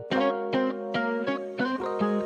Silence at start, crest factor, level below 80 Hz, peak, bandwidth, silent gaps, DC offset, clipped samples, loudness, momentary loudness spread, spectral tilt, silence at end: 0 s; 18 dB; -68 dBFS; -10 dBFS; 9 kHz; none; under 0.1%; under 0.1%; -28 LUFS; 3 LU; -7 dB/octave; 0 s